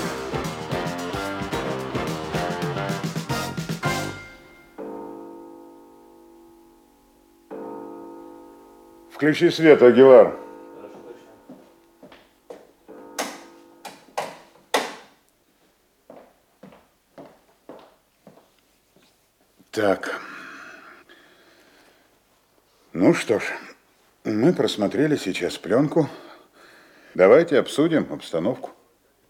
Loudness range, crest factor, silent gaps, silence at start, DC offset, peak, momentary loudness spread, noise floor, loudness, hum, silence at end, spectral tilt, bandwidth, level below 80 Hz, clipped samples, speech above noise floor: 21 LU; 24 dB; none; 0 s; under 0.1%; 0 dBFS; 27 LU; -62 dBFS; -21 LUFS; none; 0.6 s; -5.5 dB/octave; 17 kHz; -56 dBFS; under 0.1%; 45 dB